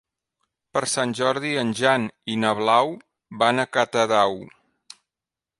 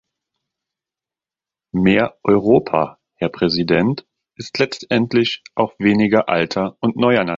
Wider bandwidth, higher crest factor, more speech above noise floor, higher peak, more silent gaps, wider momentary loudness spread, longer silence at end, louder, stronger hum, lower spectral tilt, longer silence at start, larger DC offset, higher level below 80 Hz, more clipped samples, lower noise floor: first, 11.5 kHz vs 7.6 kHz; about the same, 20 dB vs 18 dB; second, 67 dB vs 73 dB; second, -4 dBFS vs 0 dBFS; neither; about the same, 9 LU vs 10 LU; first, 1.15 s vs 0 s; second, -22 LUFS vs -18 LUFS; neither; second, -3.5 dB/octave vs -6.5 dB/octave; second, 0.75 s vs 1.75 s; neither; second, -68 dBFS vs -50 dBFS; neither; about the same, -89 dBFS vs -90 dBFS